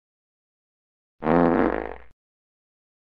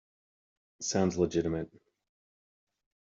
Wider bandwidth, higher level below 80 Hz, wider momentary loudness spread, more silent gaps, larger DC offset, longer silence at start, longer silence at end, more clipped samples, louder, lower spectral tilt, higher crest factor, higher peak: second, 5.2 kHz vs 7.8 kHz; first, -46 dBFS vs -62 dBFS; about the same, 12 LU vs 10 LU; neither; neither; first, 1.2 s vs 0.8 s; second, 1.1 s vs 1.45 s; neither; first, -22 LUFS vs -31 LUFS; first, -10 dB/octave vs -5 dB/octave; about the same, 22 dB vs 20 dB; first, -4 dBFS vs -14 dBFS